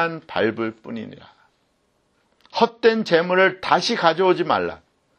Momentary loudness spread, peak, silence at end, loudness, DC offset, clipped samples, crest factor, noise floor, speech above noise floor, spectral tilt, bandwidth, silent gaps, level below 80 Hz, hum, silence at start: 15 LU; -2 dBFS; 0.4 s; -20 LUFS; under 0.1%; under 0.1%; 20 dB; -66 dBFS; 46 dB; -5 dB/octave; 9.8 kHz; none; -64 dBFS; none; 0 s